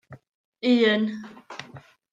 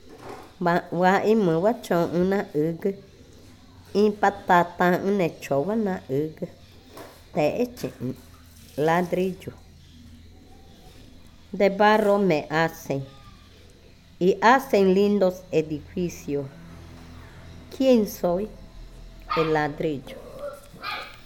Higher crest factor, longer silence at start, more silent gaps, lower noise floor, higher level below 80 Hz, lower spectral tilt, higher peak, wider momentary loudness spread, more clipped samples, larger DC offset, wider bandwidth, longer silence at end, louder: about the same, 18 dB vs 20 dB; about the same, 0.1 s vs 0.05 s; first, 0.29-0.53 s vs none; about the same, -48 dBFS vs -50 dBFS; second, -74 dBFS vs -52 dBFS; about the same, -6 dB/octave vs -6.5 dB/octave; about the same, -8 dBFS vs -6 dBFS; about the same, 21 LU vs 22 LU; neither; neither; second, 7.6 kHz vs 18.5 kHz; first, 0.35 s vs 0.05 s; about the same, -22 LUFS vs -23 LUFS